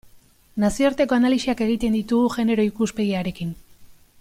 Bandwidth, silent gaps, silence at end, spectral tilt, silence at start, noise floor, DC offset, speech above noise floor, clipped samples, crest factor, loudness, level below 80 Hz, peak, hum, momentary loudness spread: 15.5 kHz; none; 0.3 s; -6 dB/octave; 0.55 s; -52 dBFS; under 0.1%; 32 dB; under 0.1%; 16 dB; -21 LUFS; -46 dBFS; -6 dBFS; none; 12 LU